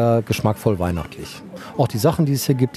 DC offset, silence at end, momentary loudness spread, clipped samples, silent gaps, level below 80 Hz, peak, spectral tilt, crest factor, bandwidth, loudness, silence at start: under 0.1%; 0 s; 15 LU; under 0.1%; none; -44 dBFS; -2 dBFS; -6.5 dB/octave; 18 dB; 14.5 kHz; -20 LUFS; 0 s